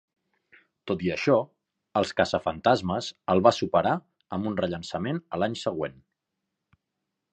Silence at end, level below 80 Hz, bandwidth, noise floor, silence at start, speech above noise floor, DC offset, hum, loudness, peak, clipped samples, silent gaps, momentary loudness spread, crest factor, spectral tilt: 1.4 s; -56 dBFS; 9.2 kHz; -83 dBFS; 0.85 s; 58 dB; under 0.1%; none; -27 LUFS; -4 dBFS; under 0.1%; none; 11 LU; 24 dB; -6 dB/octave